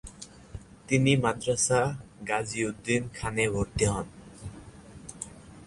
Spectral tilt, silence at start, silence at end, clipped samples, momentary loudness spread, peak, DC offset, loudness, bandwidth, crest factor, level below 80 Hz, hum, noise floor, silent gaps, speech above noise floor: -4.5 dB/octave; 0.05 s; 0 s; under 0.1%; 22 LU; -10 dBFS; under 0.1%; -28 LUFS; 11.5 kHz; 20 dB; -48 dBFS; none; -48 dBFS; none; 21 dB